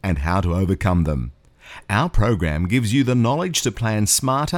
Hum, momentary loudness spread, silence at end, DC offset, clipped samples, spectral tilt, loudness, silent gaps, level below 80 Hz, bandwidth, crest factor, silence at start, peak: none; 6 LU; 0 s; under 0.1%; under 0.1%; -5 dB/octave; -20 LUFS; none; -32 dBFS; 18 kHz; 16 dB; 0.05 s; -4 dBFS